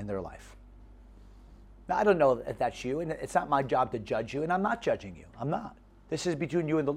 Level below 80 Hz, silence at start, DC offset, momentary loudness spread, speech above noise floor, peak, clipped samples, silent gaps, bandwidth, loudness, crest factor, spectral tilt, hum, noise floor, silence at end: -54 dBFS; 0 s; under 0.1%; 12 LU; 22 dB; -12 dBFS; under 0.1%; none; 14 kHz; -30 LUFS; 18 dB; -6 dB/octave; none; -52 dBFS; 0 s